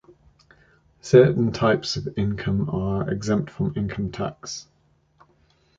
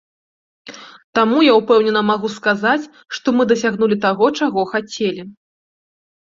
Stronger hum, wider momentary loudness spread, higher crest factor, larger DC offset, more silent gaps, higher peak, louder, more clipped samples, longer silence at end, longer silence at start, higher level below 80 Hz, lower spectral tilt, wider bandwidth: neither; first, 15 LU vs 10 LU; first, 22 dB vs 16 dB; neither; second, none vs 1.04-1.13 s; about the same, -2 dBFS vs -2 dBFS; second, -23 LUFS vs -16 LUFS; neither; first, 1.15 s vs 0.9 s; first, 1.05 s vs 0.65 s; first, -46 dBFS vs -62 dBFS; first, -6.5 dB/octave vs -5 dB/octave; about the same, 7.8 kHz vs 7.6 kHz